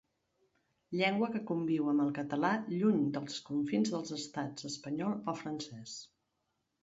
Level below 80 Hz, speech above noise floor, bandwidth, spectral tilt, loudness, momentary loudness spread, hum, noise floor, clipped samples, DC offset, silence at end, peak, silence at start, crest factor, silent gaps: -78 dBFS; 48 dB; 8 kHz; -5.5 dB/octave; -35 LUFS; 11 LU; none; -83 dBFS; under 0.1%; under 0.1%; 0.8 s; -16 dBFS; 0.9 s; 20 dB; none